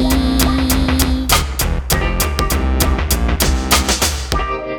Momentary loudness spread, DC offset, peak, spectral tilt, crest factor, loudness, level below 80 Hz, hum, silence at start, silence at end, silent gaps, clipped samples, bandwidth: 5 LU; under 0.1%; 0 dBFS; -4 dB/octave; 16 dB; -16 LUFS; -18 dBFS; none; 0 s; 0 s; none; under 0.1%; over 20 kHz